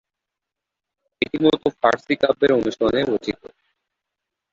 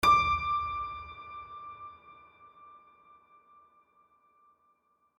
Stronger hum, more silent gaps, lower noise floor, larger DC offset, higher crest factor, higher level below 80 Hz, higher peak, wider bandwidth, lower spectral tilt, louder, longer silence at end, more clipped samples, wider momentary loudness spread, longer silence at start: neither; neither; first, -85 dBFS vs -72 dBFS; neither; about the same, 20 dB vs 22 dB; about the same, -54 dBFS vs -54 dBFS; first, -2 dBFS vs -12 dBFS; second, 7.6 kHz vs 15.5 kHz; first, -6 dB/octave vs -3 dB/octave; first, -20 LUFS vs -31 LUFS; second, 1.2 s vs 2.5 s; neither; second, 8 LU vs 29 LU; first, 1.2 s vs 0 s